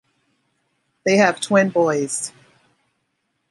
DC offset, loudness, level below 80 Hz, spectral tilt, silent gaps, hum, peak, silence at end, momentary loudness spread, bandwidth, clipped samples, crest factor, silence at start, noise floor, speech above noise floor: under 0.1%; -19 LUFS; -68 dBFS; -4.5 dB/octave; none; none; -2 dBFS; 1.2 s; 10 LU; 11.5 kHz; under 0.1%; 20 dB; 1.05 s; -72 dBFS; 55 dB